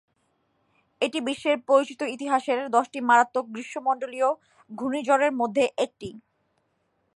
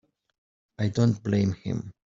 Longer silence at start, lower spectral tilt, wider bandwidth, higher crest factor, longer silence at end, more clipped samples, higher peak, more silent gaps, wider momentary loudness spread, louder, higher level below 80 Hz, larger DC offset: first, 1 s vs 0.8 s; second, -3.5 dB/octave vs -7.5 dB/octave; first, 11.5 kHz vs 7.6 kHz; about the same, 20 dB vs 18 dB; first, 0.95 s vs 0.25 s; neither; about the same, -6 dBFS vs -8 dBFS; neither; first, 12 LU vs 9 LU; about the same, -25 LUFS vs -27 LUFS; second, -72 dBFS vs -60 dBFS; neither